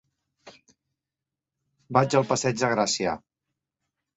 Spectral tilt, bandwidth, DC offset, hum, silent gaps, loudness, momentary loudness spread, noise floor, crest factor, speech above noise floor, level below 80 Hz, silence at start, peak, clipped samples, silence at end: -4 dB/octave; 8.4 kHz; under 0.1%; none; none; -24 LUFS; 7 LU; -88 dBFS; 24 dB; 65 dB; -64 dBFS; 0.45 s; -6 dBFS; under 0.1%; 1 s